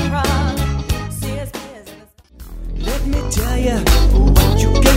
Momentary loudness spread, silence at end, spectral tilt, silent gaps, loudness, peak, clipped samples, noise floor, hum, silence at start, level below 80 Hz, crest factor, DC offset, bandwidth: 18 LU; 0 s; -5 dB/octave; none; -17 LUFS; 0 dBFS; under 0.1%; -42 dBFS; none; 0 s; -18 dBFS; 16 dB; under 0.1%; 16.5 kHz